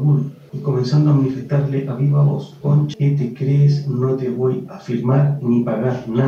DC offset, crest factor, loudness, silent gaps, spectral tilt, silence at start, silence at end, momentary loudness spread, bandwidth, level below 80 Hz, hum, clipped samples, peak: under 0.1%; 14 dB; -18 LUFS; none; -9.5 dB/octave; 0 s; 0 s; 7 LU; 6.6 kHz; -60 dBFS; none; under 0.1%; -4 dBFS